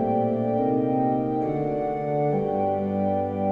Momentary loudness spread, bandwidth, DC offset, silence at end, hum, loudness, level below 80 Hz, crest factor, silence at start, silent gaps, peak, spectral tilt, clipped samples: 3 LU; 5 kHz; under 0.1%; 0 s; none; -25 LUFS; -54 dBFS; 12 dB; 0 s; none; -12 dBFS; -11 dB/octave; under 0.1%